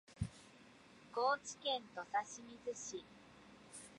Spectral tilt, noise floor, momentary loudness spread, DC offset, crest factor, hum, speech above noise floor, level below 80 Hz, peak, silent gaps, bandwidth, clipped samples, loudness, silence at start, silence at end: -3 dB/octave; -63 dBFS; 23 LU; under 0.1%; 22 dB; none; 21 dB; -64 dBFS; -24 dBFS; none; 11.5 kHz; under 0.1%; -43 LUFS; 0.1 s; 0 s